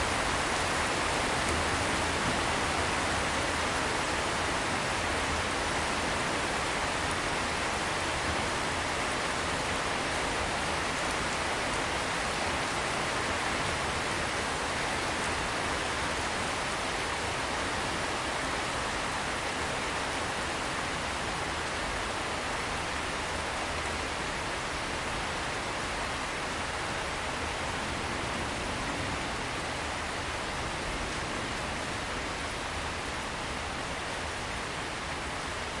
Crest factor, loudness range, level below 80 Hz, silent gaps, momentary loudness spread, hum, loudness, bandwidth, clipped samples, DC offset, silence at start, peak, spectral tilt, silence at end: 16 dB; 4 LU; -46 dBFS; none; 5 LU; none; -31 LUFS; 11.5 kHz; under 0.1%; under 0.1%; 0 s; -16 dBFS; -3 dB/octave; 0 s